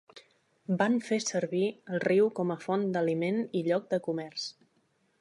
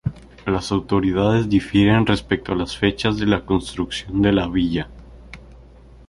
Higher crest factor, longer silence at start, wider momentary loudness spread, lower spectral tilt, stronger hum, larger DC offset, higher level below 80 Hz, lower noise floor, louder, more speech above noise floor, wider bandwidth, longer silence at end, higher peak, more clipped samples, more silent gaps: about the same, 18 dB vs 18 dB; about the same, 0.15 s vs 0.05 s; about the same, 9 LU vs 10 LU; about the same, -5.5 dB/octave vs -6.5 dB/octave; neither; neither; second, -82 dBFS vs -38 dBFS; first, -72 dBFS vs -45 dBFS; second, -30 LUFS vs -20 LUFS; first, 42 dB vs 26 dB; about the same, 11.5 kHz vs 11.5 kHz; first, 0.7 s vs 0.5 s; second, -12 dBFS vs -2 dBFS; neither; neither